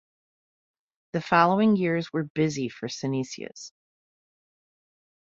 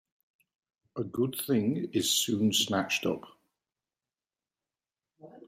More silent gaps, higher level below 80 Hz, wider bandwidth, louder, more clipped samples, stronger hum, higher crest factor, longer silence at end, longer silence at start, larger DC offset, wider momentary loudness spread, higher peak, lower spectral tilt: first, 2.30-2.35 s vs none; first, -68 dBFS vs -74 dBFS; second, 7.6 kHz vs 16 kHz; first, -25 LUFS vs -29 LUFS; neither; neither; about the same, 24 dB vs 20 dB; first, 1.55 s vs 0 s; first, 1.15 s vs 0.95 s; neither; first, 17 LU vs 12 LU; first, -4 dBFS vs -14 dBFS; first, -6 dB/octave vs -3.5 dB/octave